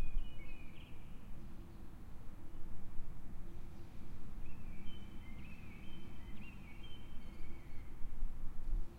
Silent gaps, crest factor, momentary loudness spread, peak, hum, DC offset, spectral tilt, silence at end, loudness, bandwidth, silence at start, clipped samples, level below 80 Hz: none; 14 dB; 6 LU; -24 dBFS; none; under 0.1%; -6.5 dB/octave; 0 s; -54 LUFS; 3.4 kHz; 0 s; under 0.1%; -44 dBFS